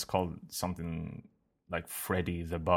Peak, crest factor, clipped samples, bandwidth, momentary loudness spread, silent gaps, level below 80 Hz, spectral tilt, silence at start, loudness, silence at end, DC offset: -12 dBFS; 22 dB; under 0.1%; 17.5 kHz; 7 LU; none; -52 dBFS; -5 dB/octave; 0 s; -36 LUFS; 0 s; under 0.1%